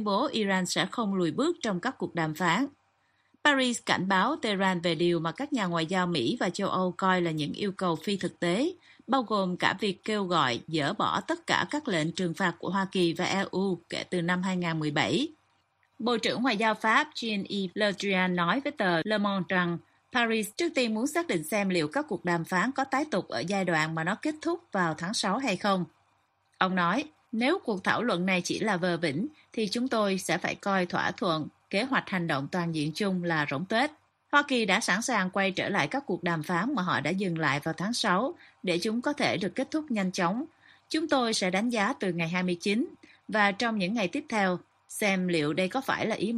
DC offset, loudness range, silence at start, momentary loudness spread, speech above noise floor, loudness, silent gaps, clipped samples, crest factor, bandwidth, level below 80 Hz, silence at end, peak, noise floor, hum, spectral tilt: under 0.1%; 2 LU; 0 s; 5 LU; 42 dB; -28 LUFS; none; under 0.1%; 20 dB; 13 kHz; -70 dBFS; 0 s; -8 dBFS; -70 dBFS; none; -4.5 dB/octave